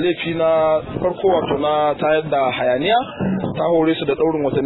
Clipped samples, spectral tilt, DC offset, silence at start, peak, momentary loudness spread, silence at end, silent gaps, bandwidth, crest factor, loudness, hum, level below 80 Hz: under 0.1%; -10.5 dB/octave; under 0.1%; 0 s; -4 dBFS; 4 LU; 0 s; none; 4.1 kHz; 14 dB; -18 LUFS; none; -48 dBFS